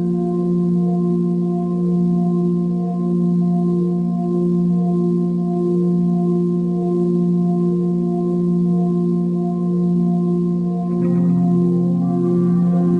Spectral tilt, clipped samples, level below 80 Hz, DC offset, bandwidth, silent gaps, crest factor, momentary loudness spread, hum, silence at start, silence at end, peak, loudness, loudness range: -12 dB/octave; under 0.1%; -58 dBFS; under 0.1%; 1.5 kHz; none; 10 dB; 3 LU; none; 0 s; 0 s; -6 dBFS; -18 LUFS; 1 LU